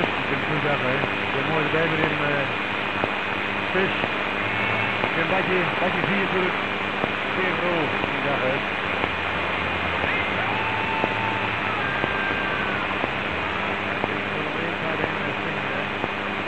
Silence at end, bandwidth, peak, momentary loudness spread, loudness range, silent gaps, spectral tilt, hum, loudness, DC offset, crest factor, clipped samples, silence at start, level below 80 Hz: 0 s; 15 kHz; -4 dBFS; 4 LU; 2 LU; none; -6 dB/octave; none; -23 LUFS; 0.7%; 20 dB; under 0.1%; 0 s; -50 dBFS